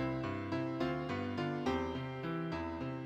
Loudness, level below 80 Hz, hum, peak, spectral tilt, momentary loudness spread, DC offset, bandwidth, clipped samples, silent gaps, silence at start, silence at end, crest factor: -38 LUFS; -58 dBFS; none; -22 dBFS; -7.5 dB/octave; 4 LU; under 0.1%; 8.8 kHz; under 0.1%; none; 0 s; 0 s; 16 dB